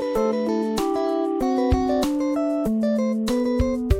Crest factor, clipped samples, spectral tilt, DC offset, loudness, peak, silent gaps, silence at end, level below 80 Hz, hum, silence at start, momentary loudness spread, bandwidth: 16 dB; under 0.1%; -7 dB/octave; under 0.1%; -23 LUFS; -6 dBFS; none; 0 s; -34 dBFS; none; 0 s; 2 LU; 16.5 kHz